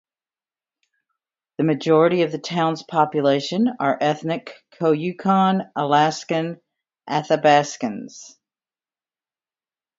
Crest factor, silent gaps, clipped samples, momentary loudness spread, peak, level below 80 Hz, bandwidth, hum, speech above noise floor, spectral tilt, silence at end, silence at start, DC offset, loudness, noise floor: 20 dB; none; under 0.1%; 13 LU; -2 dBFS; -70 dBFS; 7.8 kHz; none; over 70 dB; -5.5 dB/octave; 1.7 s; 1.6 s; under 0.1%; -20 LUFS; under -90 dBFS